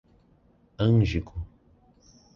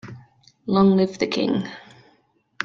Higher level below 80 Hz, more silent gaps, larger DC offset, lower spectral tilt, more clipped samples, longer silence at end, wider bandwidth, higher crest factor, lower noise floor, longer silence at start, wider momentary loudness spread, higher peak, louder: first, -42 dBFS vs -58 dBFS; neither; neither; first, -8.5 dB/octave vs -7 dB/octave; neither; first, 0.9 s vs 0 s; about the same, 7 kHz vs 7.4 kHz; about the same, 18 dB vs 18 dB; about the same, -61 dBFS vs -63 dBFS; first, 0.8 s vs 0.05 s; second, 19 LU vs 22 LU; second, -12 dBFS vs -4 dBFS; second, -25 LUFS vs -21 LUFS